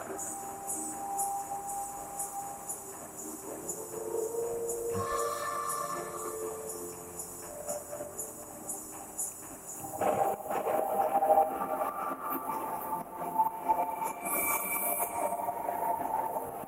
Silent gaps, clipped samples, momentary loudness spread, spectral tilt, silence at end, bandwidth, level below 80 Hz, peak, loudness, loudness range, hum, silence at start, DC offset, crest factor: none; under 0.1%; 11 LU; -3 dB/octave; 0 s; 16 kHz; -66 dBFS; -14 dBFS; -34 LUFS; 7 LU; none; 0 s; under 0.1%; 20 dB